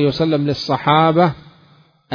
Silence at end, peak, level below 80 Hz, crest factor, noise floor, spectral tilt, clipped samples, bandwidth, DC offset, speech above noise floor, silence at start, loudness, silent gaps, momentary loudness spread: 0.75 s; 0 dBFS; -50 dBFS; 16 dB; -51 dBFS; -7.5 dB/octave; under 0.1%; 5.4 kHz; under 0.1%; 36 dB; 0 s; -16 LUFS; none; 6 LU